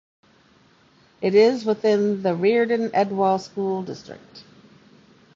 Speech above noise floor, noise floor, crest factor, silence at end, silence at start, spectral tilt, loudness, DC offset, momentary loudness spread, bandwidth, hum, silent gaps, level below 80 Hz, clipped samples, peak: 36 dB; -57 dBFS; 18 dB; 0.95 s; 1.2 s; -6.5 dB/octave; -21 LUFS; under 0.1%; 16 LU; 7.6 kHz; none; none; -68 dBFS; under 0.1%; -4 dBFS